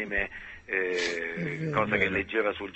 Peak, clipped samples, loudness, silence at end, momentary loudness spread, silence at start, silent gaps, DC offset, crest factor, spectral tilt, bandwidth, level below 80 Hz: -10 dBFS; under 0.1%; -29 LUFS; 0 s; 7 LU; 0 s; none; under 0.1%; 20 dB; -5 dB/octave; 8.4 kHz; -52 dBFS